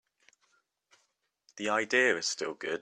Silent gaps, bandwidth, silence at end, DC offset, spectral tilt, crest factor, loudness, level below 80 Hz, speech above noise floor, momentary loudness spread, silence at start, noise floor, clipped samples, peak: none; 11 kHz; 0 s; under 0.1%; -1.5 dB/octave; 20 dB; -29 LUFS; -82 dBFS; 47 dB; 10 LU; 1.55 s; -77 dBFS; under 0.1%; -14 dBFS